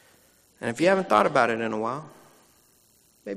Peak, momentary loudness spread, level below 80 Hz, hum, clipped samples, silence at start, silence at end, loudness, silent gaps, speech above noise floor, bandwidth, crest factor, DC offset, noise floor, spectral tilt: -6 dBFS; 15 LU; -70 dBFS; none; under 0.1%; 0.6 s; 0 s; -24 LUFS; none; 38 dB; 15 kHz; 20 dB; under 0.1%; -61 dBFS; -5.5 dB/octave